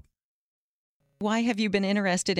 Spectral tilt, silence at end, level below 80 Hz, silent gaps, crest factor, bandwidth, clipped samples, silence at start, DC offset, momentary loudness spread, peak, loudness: -4.5 dB/octave; 0 s; -64 dBFS; none; 18 dB; 12 kHz; under 0.1%; 1.2 s; under 0.1%; 4 LU; -10 dBFS; -26 LUFS